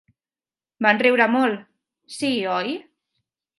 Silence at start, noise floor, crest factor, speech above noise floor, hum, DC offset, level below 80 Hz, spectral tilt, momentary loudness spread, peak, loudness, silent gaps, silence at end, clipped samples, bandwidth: 0.8 s; under -90 dBFS; 22 dB; over 70 dB; none; under 0.1%; -76 dBFS; -4.5 dB/octave; 17 LU; -2 dBFS; -20 LUFS; none; 0.75 s; under 0.1%; 11.5 kHz